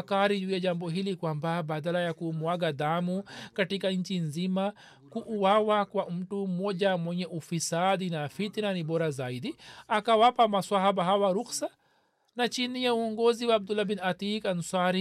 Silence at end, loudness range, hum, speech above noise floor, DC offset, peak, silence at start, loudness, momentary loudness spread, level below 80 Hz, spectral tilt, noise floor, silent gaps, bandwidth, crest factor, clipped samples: 0 s; 4 LU; none; 41 dB; under 0.1%; -12 dBFS; 0 s; -29 LUFS; 10 LU; -74 dBFS; -5 dB/octave; -70 dBFS; none; 14 kHz; 16 dB; under 0.1%